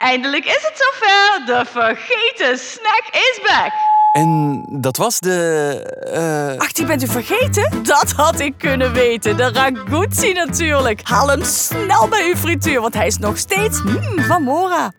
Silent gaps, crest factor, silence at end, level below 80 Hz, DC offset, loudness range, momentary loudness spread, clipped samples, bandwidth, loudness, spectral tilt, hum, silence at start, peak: none; 16 dB; 0.1 s; -44 dBFS; under 0.1%; 2 LU; 6 LU; under 0.1%; over 20 kHz; -15 LUFS; -3.5 dB/octave; none; 0 s; 0 dBFS